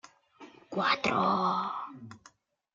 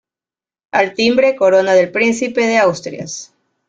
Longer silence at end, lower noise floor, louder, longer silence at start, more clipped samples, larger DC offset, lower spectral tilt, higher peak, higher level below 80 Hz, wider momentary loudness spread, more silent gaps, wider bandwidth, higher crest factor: first, 0.6 s vs 0.45 s; second, -62 dBFS vs under -90 dBFS; second, -29 LUFS vs -14 LUFS; second, 0.4 s vs 0.75 s; neither; neither; about the same, -5 dB/octave vs -4 dB/octave; second, -14 dBFS vs -2 dBFS; second, -70 dBFS vs -58 dBFS; first, 19 LU vs 14 LU; neither; second, 7.8 kHz vs 9.2 kHz; about the same, 18 dB vs 14 dB